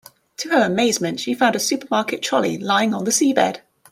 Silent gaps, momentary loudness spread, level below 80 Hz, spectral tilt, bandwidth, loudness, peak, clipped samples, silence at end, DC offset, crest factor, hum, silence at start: none; 6 LU; -66 dBFS; -3 dB/octave; 16.5 kHz; -19 LUFS; -4 dBFS; under 0.1%; 0.35 s; under 0.1%; 16 dB; none; 0.4 s